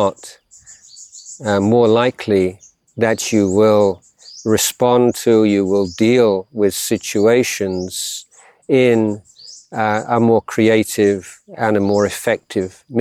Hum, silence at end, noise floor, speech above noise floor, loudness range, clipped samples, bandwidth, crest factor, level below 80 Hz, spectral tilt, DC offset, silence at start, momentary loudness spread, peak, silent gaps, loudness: none; 0 s; -44 dBFS; 29 dB; 3 LU; under 0.1%; 16.5 kHz; 14 dB; -56 dBFS; -5 dB/octave; under 0.1%; 0 s; 12 LU; -2 dBFS; none; -16 LUFS